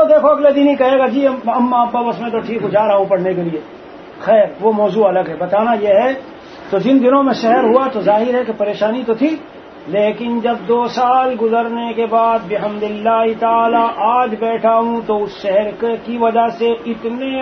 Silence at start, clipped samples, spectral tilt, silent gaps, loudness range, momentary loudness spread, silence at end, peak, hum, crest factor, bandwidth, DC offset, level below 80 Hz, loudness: 0 s; under 0.1%; -7 dB/octave; none; 3 LU; 9 LU; 0 s; 0 dBFS; none; 14 dB; 6.4 kHz; under 0.1%; -56 dBFS; -15 LUFS